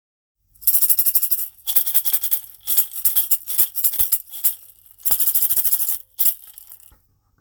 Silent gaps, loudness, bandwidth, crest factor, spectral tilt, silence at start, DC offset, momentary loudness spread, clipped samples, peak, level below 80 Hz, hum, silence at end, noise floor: none; -16 LUFS; over 20 kHz; 20 dB; 2 dB/octave; 0.6 s; under 0.1%; 7 LU; under 0.1%; 0 dBFS; -56 dBFS; none; 0.65 s; -58 dBFS